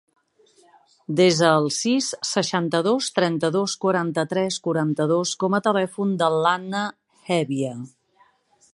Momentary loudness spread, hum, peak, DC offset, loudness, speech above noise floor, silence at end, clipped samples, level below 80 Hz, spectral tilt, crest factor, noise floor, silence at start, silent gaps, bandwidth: 9 LU; none; -2 dBFS; under 0.1%; -22 LUFS; 39 dB; 0.85 s; under 0.1%; -70 dBFS; -4.5 dB/octave; 20 dB; -61 dBFS; 1.1 s; none; 11.5 kHz